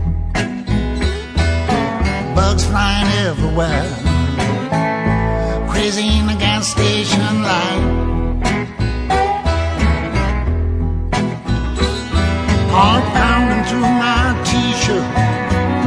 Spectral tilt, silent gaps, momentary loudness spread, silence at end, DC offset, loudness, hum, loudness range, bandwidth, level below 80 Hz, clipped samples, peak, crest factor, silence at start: -5 dB/octave; none; 6 LU; 0 s; under 0.1%; -16 LUFS; none; 3 LU; 11 kHz; -22 dBFS; under 0.1%; 0 dBFS; 16 dB; 0 s